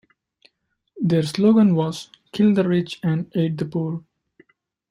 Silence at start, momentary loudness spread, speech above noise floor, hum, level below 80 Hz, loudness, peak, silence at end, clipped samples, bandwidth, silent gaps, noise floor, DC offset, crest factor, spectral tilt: 0.95 s; 13 LU; 52 dB; none; -62 dBFS; -20 LUFS; -6 dBFS; 0.9 s; under 0.1%; 12 kHz; none; -71 dBFS; under 0.1%; 16 dB; -7.5 dB/octave